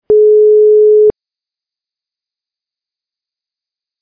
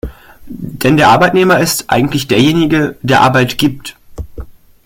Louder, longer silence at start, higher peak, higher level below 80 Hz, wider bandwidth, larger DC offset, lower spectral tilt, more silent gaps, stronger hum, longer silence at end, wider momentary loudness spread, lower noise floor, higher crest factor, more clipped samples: first, -7 LUFS vs -10 LUFS; about the same, 0.1 s vs 0.05 s; about the same, -2 dBFS vs 0 dBFS; second, -54 dBFS vs -36 dBFS; second, 1.2 kHz vs 17 kHz; neither; first, -12.5 dB/octave vs -5 dB/octave; neither; neither; first, 2.9 s vs 0.35 s; second, 3 LU vs 21 LU; first, -87 dBFS vs -30 dBFS; about the same, 10 dB vs 12 dB; neither